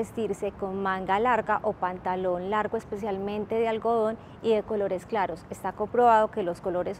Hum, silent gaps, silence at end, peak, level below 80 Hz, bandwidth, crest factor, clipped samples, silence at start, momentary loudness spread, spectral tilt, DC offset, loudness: none; none; 0 s; -10 dBFS; -56 dBFS; 14 kHz; 18 dB; under 0.1%; 0 s; 9 LU; -6 dB/octave; under 0.1%; -27 LUFS